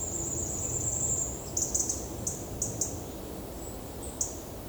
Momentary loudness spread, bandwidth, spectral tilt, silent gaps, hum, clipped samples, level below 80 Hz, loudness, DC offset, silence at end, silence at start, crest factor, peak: 12 LU; over 20 kHz; -3.5 dB/octave; none; none; under 0.1%; -46 dBFS; -32 LUFS; under 0.1%; 0 s; 0 s; 20 dB; -14 dBFS